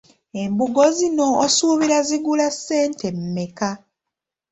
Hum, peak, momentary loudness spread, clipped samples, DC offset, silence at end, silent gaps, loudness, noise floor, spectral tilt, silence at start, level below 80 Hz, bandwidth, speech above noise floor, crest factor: none; -4 dBFS; 11 LU; under 0.1%; under 0.1%; 0.75 s; none; -19 LUFS; -84 dBFS; -4 dB/octave; 0.35 s; -62 dBFS; 8.4 kHz; 65 dB; 16 dB